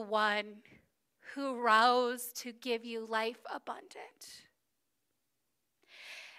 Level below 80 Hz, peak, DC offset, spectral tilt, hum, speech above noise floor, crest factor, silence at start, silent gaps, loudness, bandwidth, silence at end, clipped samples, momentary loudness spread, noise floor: under -90 dBFS; -14 dBFS; under 0.1%; -2 dB/octave; none; 50 dB; 22 dB; 0 s; none; -33 LUFS; 15.5 kHz; 0 s; under 0.1%; 23 LU; -84 dBFS